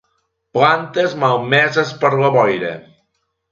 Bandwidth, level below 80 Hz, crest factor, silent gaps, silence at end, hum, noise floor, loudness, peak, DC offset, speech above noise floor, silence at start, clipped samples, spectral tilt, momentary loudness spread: 7.4 kHz; -60 dBFS; 16 dB; none; 0.7 s; none; -70 dBFS; -15 LUFS; 0 dBFS; under 0.1%; 54 dB; 0.55 s; under 0.1%; -5.5 dB/octave; 10 LU